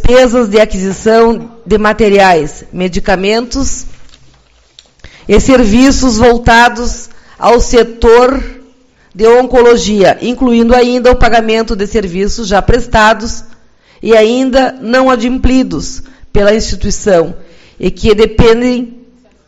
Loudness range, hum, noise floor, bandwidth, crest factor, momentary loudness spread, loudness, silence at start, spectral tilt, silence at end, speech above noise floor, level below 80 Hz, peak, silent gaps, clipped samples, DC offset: 4 LU; none; -45 dBFS; 10 kHz; 8 dB; 12 LU; -9 LUFS; 0 s; -5 dB/octave; 0.5 s; 37 dB; -20 dBFS; 0 dBFS; none; 2%; under 0.1%